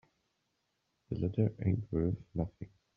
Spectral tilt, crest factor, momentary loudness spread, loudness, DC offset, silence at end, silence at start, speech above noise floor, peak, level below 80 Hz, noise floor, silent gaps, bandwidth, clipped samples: -11 dB/octave; 20 dB; 10 LU; -35 LUFS; under 0.1%; 0.3 s; 1.1 s; 47 dB; -16 dBFS; -56 dBFS; -81 dBFS; none; 5 kHz; under 0.1%